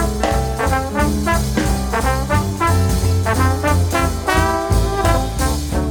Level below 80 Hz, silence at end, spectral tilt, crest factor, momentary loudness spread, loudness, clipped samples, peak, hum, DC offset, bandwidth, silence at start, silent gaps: -22 dBFS; 0 s; -5.5 dB/octave; 16 dB; 3 LU; -18 LUFS; under 0.1%; -2 dBFS; none; 0.3%; 19 kHz; 0 s; none